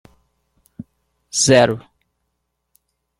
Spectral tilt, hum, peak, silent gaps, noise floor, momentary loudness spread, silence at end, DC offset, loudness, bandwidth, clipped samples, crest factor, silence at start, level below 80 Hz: -3.5 dB/octave; 60 Hz at -50 dBFS; -2 dBFS; none; -74 dBFS; 28 LU; 1.4 s; under 0.1%; -16 LUFS; 15 kHz; under 0.1%; 20 dB; 1.35 s; -56 dBFS